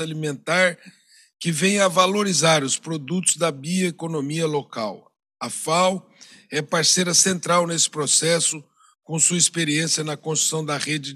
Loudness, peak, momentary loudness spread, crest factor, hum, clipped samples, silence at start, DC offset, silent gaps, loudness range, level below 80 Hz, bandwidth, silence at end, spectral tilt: -20 LUFS; -4 dBFS; 12 LU; 18 dB; none; under 0.1%; 0 s; under 0.1%; none; 5 LU; -80 dBFS; 14.5 kHz; 0 s; -2.5 dB/octave